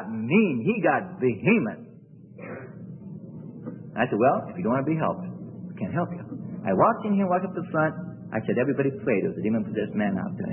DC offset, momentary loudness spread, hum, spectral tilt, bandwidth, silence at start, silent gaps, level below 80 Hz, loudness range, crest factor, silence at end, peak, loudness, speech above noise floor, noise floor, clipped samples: under 0.1%; 18 LU; none; -12 dB/octave; 3.3 kHz; 0 s; none; -66 dBFS; 3 LU; 20 dB; 0 s; -6 dBFS; -25 LUFS; 23 dB; -47 dBFS; under 0.1%